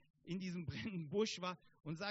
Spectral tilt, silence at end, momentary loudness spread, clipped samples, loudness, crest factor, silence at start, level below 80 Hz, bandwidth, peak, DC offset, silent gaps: -4.5 dB/octave; 0 s; 9 LU; under 0.1%; -44 LUFS; 18 dB; 0.25 s; -70 dBFS; 7.6 kHz; -26 dBFS; under 0.1%; none